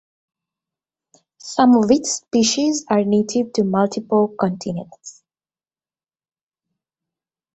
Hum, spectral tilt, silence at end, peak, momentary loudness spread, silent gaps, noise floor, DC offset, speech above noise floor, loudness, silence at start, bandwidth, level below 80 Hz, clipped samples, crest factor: none; -4.5 dB/octave; 2.45 s; -2 dBFS; 14 LU; none; under -90 dBFS; under 0.1%; over 72 dB; -18 LUFS; 1.45 s; 8.2 kHz; -60 dBFS; under 0.1%; 18 dB